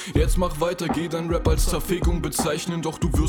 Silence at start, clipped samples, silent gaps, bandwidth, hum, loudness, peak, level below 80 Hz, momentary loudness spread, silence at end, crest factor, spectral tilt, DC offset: 0 s; under 0.1%; none; over 20 kHz; none; -24 LUFS; -8 dBFS; -26 dBFS; 4 LU; 0 s; 14 dB; -5.5 dB/octave; under 0.1%